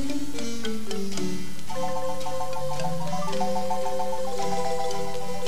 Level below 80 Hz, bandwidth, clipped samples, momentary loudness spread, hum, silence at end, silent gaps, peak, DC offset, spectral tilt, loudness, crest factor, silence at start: -52 dBFS; 15.5 kHz; under 0.1%; 4 LU; none; 0 s; none; -12 dBFS; 8%; -4.5 dB/octave; -30 LUFS; 16 dB; 0 s